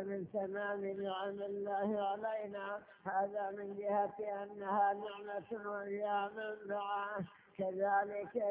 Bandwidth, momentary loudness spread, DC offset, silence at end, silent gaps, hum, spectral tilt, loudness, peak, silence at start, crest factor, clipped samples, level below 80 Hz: 3.9 kHz; 9 LU; under 0.1%; 0 s; none; none; -4 dB/octave; -39 LUFS; -24 dBFS; 0 s; 16 dB; under 0.1%; -82 dBFS